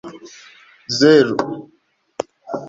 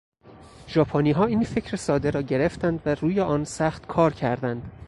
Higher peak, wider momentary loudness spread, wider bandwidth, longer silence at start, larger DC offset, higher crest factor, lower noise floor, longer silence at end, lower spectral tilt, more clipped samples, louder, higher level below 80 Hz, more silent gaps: first, -2 dBFS vs -6 dBFS; first, 25 LU vs 6 LU; second, 7.8 kHz vs 11.5 kHz; second, 0.05 s vs 0.25 s; neither; about the same, 18 dB vs 18 dB; first, -60 dBFS vs -48 dBFS; about the same, 0 s vs 0 s; second, -5 dB/octave vs -7 dB/octave; neither; first, -16 LUFS vs -24 LUFS; second, -60 dBFS vs -48 dBFS; neither